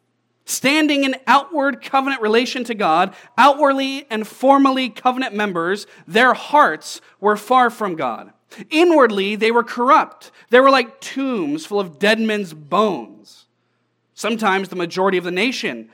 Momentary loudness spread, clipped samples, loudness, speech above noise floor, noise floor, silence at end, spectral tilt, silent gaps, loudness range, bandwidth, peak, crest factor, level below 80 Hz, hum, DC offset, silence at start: 11 LU; under 0.1%; -17 LUFS; 50 dB; -67 dBFS; 0.1 s; -4 dB/octave; none; 5 LU; 17.5 kHz; 0 dBFS; 18 dB; -84 dBFS; none; under 0.1%; 0.5 s